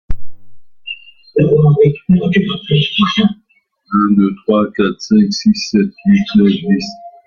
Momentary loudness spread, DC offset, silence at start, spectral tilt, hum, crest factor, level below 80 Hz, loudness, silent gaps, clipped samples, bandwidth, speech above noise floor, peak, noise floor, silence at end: 17 LU; under 0.1%; 0.1 s; -7 dB/octave; none; 12 dB; -38 dBFS; -13 LUFS; none; under 0.1%; 7 kHz; 45 dB; -2 dBFS; -58 dBFS; 0.15 s